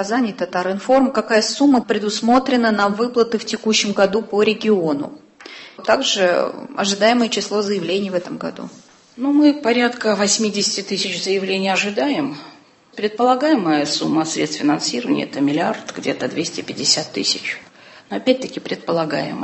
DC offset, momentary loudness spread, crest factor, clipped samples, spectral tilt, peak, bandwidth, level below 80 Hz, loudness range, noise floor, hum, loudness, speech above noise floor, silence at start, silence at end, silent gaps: under 0.1%; 10 LU; 16 dB; under 0.1%; -3.5 dB/octave; -2 dBFS; 8.6 kHz; -62 dBFS; 3 LU; -39 dBFS; none; -18 LUFS; 21 dB; 0 s; 0 s; none